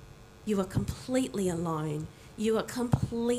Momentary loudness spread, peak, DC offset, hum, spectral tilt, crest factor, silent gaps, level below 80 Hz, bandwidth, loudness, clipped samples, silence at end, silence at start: 7 LU; -10 dBFS; under 0.1%; none; -6.5 dB/octave; 20 dB; none; -50 dBFS; 15.5 kHz; -31 LUFS; under 0.1%; 0 s; 0 s